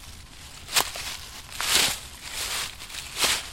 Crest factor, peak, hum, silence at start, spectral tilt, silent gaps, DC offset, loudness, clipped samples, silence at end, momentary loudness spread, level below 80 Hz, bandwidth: 24 dB; -6 dBFS; none; 0 s; 0.5 dB/octave; none; under 0.1%; -26 LUFS; under 0.1%; 0 s; 20 LU; -48 dBFS; 16.5 kHz